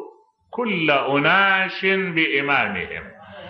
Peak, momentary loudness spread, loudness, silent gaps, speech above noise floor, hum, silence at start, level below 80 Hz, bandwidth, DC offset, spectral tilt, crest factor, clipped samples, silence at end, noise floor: -4 dBFS; 16 LU; -19 LUFS; none; 27 dB; none; 0 s; -58 dBFS; 6.2 kHz; under 0.1%; -7 dB/octave; 16 dB; under 0.1%; 0 s; -47 dBFS